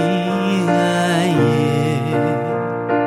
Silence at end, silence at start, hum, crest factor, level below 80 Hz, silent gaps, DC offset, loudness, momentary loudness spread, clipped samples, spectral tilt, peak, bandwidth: 0 s; 0 s; none; 14 dB; -58 dBFS; none; under 0.1%; -17 LUFS; 5 LU; under 0.1%; -6.5 dB/octave; -2 dBFS; 14 kHz